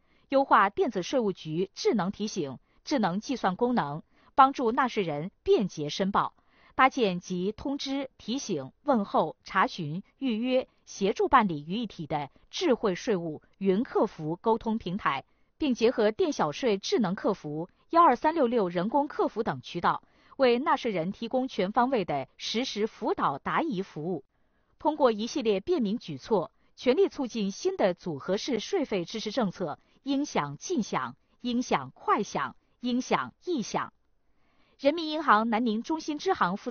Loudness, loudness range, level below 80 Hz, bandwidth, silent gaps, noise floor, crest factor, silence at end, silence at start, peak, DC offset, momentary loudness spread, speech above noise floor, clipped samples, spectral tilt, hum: -28 LUFS; 4 LU; -62 dBFS; 6.8 kHz; none; -68 dBFS; 22 dB; 0 s; 0.3 s; -6 dBFS; under 0.1%; 11 LU; 41 dB; under 0.1%; -4 dB/octave; none